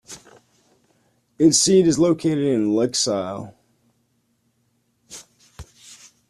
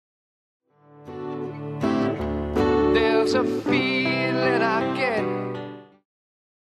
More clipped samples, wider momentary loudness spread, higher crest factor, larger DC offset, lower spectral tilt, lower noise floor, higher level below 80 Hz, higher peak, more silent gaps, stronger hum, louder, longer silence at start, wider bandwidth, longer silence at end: neither; first, 26 LU vs 13 LU; about the same, 18 dB vs 16 dB; neither; second, -4.5 dB/octave vs -6.5 dB/octave; first, -67 dBFS vs -47 dBFS; second, -56 dBFS vs -44 dBFS; first, -4 dBFS vs -8 dBFS; neither; neither; first, -18 LUFS vs -23 LUFS; second, 0.1 s vs 0.95 s; about the same, 13.5 kHz vs 12.5 kHz; second, 0.35 s vs 0.85 s